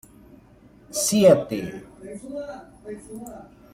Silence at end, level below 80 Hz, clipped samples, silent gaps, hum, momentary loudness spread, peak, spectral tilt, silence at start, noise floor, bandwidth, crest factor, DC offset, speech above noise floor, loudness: 0.3 s; -56 dBFS; under 0.1%; none; none; 24 LU; -4 dBFS; -4.5 dB/octave; 0.9 s; -52 dBFS; 16.5 kHz; 22 dB; under 0.1%; 28 dB; -21 LUFS